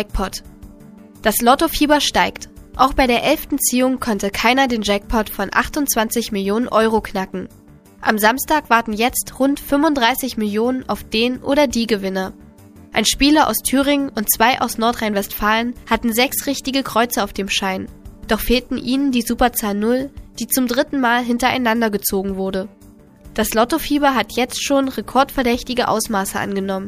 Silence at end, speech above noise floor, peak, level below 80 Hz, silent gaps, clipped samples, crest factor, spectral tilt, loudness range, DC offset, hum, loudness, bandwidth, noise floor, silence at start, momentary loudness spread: 0 s; 27 dB; 0 dBFS; -38 dBFS; none; under 0.1%; 18 dB; -3 dB/octave; 3 LU; under 0.1%; none; -18 LUFS; 15.5 kHz; -44 dBFS; 0 s; 8 LU